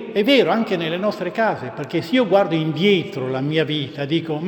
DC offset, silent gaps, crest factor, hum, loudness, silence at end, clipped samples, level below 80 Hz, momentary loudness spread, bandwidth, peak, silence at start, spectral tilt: under 0.1%; none; 16 dB; none; -20 LUFS; 0 s; under 0.1%; -66 dBFS; 8 LU; 19 kHz; -2 dBFS; 0 s; -6.5 dB/octave